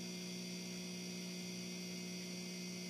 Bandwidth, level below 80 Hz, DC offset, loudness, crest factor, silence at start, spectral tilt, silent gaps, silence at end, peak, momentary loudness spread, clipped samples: 15.5 kHz; -84 dBFS; under 0.1%; -45 LUFS; 12 dB; 0 s; -3.5 dB/octave; none; 0 s; -36 dBFS; 0 LU; under 0.1%